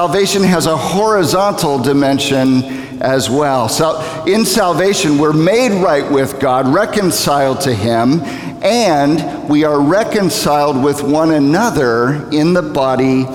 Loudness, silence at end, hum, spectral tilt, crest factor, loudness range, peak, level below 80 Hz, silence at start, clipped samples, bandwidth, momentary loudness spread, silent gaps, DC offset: -13 LUFS; 0 s; none; -5 dB/octave; 12 dB; 1 LU; -2 dBFS; -44 dBFS; 0 s; under 0.1%; 18 kHz; 4 LU; none; 0.1%